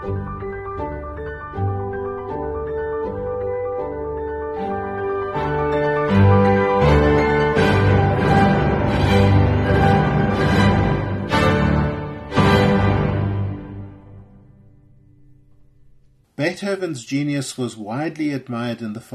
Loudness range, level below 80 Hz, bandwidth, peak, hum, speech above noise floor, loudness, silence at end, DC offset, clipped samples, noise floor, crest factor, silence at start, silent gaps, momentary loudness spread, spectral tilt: 11 LU; -32 dBFS; 12 kHz; -2 dBFS; none; 28 dB; -19 LUFS; 0 s; under 0.1%; under 0.1%; -52 dBFS; 16 dB; 0 s; none; 13 LU; -7 dB/octave